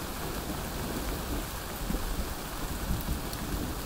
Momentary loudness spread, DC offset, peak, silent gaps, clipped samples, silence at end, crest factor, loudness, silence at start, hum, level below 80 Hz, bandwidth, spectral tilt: 2 LU; under 0.1%; -16 dBFS; none; under 0.1%; 0 s; 18 dB; -35 LUFS; 0 s; none; -38 dBFS; 16 kHz; -4.5 dB/octave